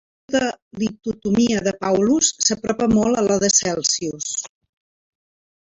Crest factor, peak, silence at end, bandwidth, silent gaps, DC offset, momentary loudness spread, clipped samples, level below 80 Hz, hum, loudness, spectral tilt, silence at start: 20 dB; -2 dBFS; 1.2 s; 8.2 kHz; 0.62-0.71 s; under 0.1%; 10 LU; under 0.1%; -50 dBFS; none; -19 LUFS; -3 dB/octave; 0.3 s